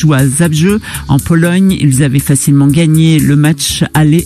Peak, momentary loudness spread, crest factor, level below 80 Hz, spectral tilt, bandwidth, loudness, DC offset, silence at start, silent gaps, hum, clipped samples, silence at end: 0 dBFS; 4 LU; 8 dB; -32 dBFS; -5.5 dB/octave; 15.5 kHz; -9 LUFS; 0.2%; 0 s; none; none; under 0.1%; 0 s